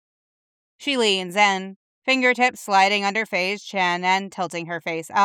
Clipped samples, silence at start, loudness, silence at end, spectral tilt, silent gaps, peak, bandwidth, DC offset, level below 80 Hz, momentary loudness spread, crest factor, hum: under 0.1%; 0.8 s; -21 LUFS; 0 s; -3 dB/octave; 1.76-2.02 s; -4 dBFS; 17 kHz; under 0.1%; -80 dBFS; 11 LU; 18 dB; none